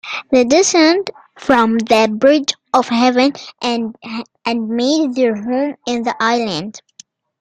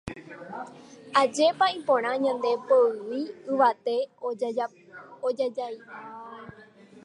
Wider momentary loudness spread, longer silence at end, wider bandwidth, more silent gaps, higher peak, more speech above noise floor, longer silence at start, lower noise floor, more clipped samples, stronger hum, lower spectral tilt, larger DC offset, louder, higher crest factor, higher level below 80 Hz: second, 12 LU vs 20 LU; first, 0.65 s vs 0.05 s; about the same, 11 kHz vs 11 kHz; neither; first, 0 dBFS vs -8 dBFS; first, 31 dB vs 26 dB; about the same, 0.05 s vs 0.05 s; second, -46 dBFS vs -51 dBFS; neither; neither; about the same, -3 dB/octave vs -4 dB/octave; neither; first, -15 LUFS vs -26 LUFS; about the same, 16 dB vs 20 dB; first, -56 dBFS vs -66 dBFS